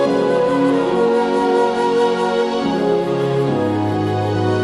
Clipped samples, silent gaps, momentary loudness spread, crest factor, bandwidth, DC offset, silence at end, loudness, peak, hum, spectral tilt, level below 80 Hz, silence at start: under 0.1%; none; 3 LU; 12 dB; 11.5 kHz; under 0.1%; 0 s; -17 LUFS; -4 dBFS; none; -7 dB/octave; -52 dBFS; 0 s